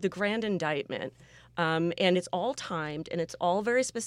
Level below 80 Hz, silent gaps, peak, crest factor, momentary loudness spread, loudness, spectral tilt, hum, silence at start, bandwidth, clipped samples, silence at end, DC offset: -66 dBFS; none; -12 dBFS; 18 dB; 9 LU; -30 LUFS; -4.5 dB/octave; none; 0 s; 14 kHz; under 0.1%; 0 s; under 0.1%